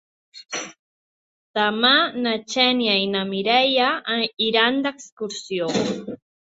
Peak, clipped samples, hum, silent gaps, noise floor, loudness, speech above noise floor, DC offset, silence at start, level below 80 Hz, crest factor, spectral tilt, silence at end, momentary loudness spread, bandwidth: -2 dBFS; under 0.1%; none; 0.79-1.54 s, 5.12-5.17 s; under -90 dBFS; -20 LUFS; over 69 dB; under 0.1%; 0.35 s; -68 dBFS; 20 dB; -3 dB/octave; 0.4 s; 15 LU; 8 kHz